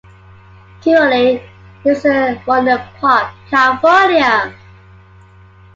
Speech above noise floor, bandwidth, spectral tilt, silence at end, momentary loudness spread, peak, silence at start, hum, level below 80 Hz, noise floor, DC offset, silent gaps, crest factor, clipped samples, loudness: 30 dB; 7.8 kHz; -5 dB/octave; 1.2 s; 8 LU; 0 dBFS; 0.85 s; none; -48 dBFS; -42 dBFS; under 0.1%; none; 14 dB; under 0.1%; -13 LUFS